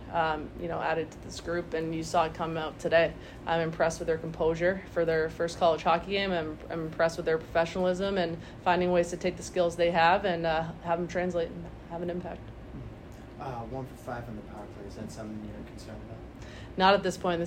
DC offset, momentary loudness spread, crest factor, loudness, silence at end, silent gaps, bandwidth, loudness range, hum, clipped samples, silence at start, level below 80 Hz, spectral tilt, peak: under 0.1%; 18 LU; 20 dB; -29 LUFS; 0 s; none; 15.5 kHz; 13 LU; none; under 0.1%; 0 s; -50 dBFS; -5.5 dB/octave; -10 dBFS